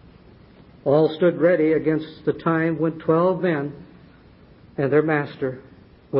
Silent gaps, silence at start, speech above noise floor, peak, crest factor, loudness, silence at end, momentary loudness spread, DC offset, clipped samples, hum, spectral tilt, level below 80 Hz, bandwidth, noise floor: none; 0.85 s; 29 dB; -6 dBFS; 16 dB; -21 LUFS; 0 s; 11 LU; under 0.1%; under 0.1%; none; -12 dB/octave; -56 dBFS; 5.4 kHz; -49 dBFS